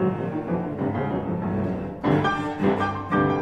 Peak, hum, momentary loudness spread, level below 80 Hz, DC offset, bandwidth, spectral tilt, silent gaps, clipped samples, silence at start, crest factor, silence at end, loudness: -10 dBFS; none; 5 LU; -48 dBFS; under 0.1%; 8.8 kHz; -8 dB/octave; none; under 0.1%; 0 s; 14 dB; 0 s; -25 LUFS